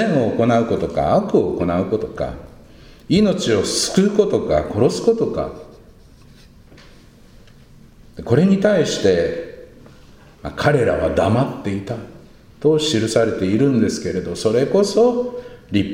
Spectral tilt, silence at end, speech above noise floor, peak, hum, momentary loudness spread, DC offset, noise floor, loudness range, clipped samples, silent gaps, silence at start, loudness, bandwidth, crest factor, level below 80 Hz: -5.5 dB/octave; 0 s; 28 dB; 0 dBFS; none; 12 LU; under 0.1%; -45 dBFS; 5 LU; under 0.1%; none; 0 s; -18 LUFS; 16 kHz; 18 dB; -42 dBFS